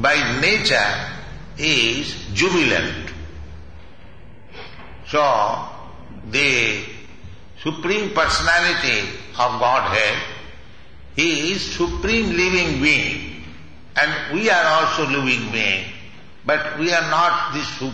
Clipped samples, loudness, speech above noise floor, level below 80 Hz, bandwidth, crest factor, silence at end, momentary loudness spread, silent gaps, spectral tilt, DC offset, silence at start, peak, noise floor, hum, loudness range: under 0.1%; -18 LUFS; 25 dB; -42 dBFS; 10.5 kHz; 18 dB; 0 s; 21 LU; none; -3.5 dB/octave; 1%; 0 s; -4 dBFS; -44 dBFS; none; 4 LU